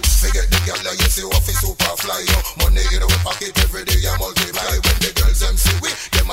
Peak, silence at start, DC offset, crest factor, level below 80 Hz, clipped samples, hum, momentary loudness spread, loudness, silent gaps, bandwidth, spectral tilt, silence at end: -2 dBFS; 0 s; under 0.1%; 14 dB; -18 dBFS; under 0.1%; none; 3 LU; -17 LUFS; none; 16.5 kHz; -3 dB/octave; 0 s